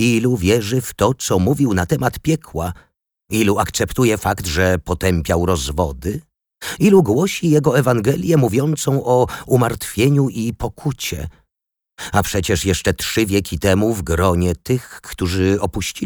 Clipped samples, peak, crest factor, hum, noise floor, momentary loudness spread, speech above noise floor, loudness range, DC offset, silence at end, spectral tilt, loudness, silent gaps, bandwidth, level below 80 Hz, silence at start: under 0.1%; -2 dBFS; 16 dB; none; -83 dBFS; 9 LU; 66 dB; 4 LU; under 0.1%; 0 s; -5.5 dB/octave; -18 LUFS; none; over 20 kHz; -36 dBFS; 0 s